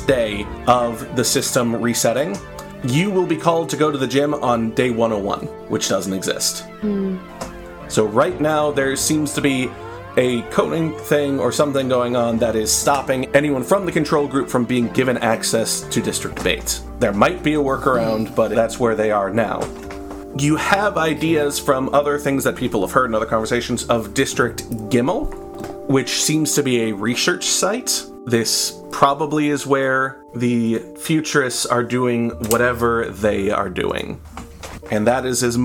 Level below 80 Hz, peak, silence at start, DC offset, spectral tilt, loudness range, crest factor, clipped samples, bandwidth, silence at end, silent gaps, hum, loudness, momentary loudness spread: -42 dBFS; 0 dBFS; 0 s; under 0.1%; -4 dB/octave; 2 LU; 20 dB; under 0.1%; 19 kHz; 0 s; none; none; -19 LUFS; 8 LU